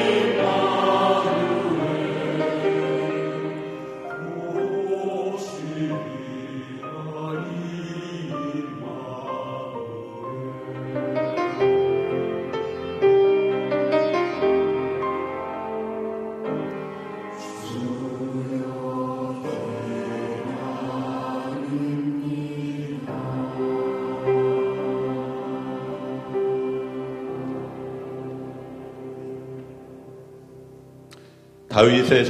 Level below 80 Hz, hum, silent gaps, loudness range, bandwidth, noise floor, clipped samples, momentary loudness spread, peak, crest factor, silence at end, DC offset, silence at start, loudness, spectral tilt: -62 dBFS; none; none; 10 LU; 11 kHz; -48 dBFS; under 0.1%; 14 LU; -2 dBFS; 24 dB; 0 s; under 0.1%; 0 s; -25 LUFS; -6.5 dB/octave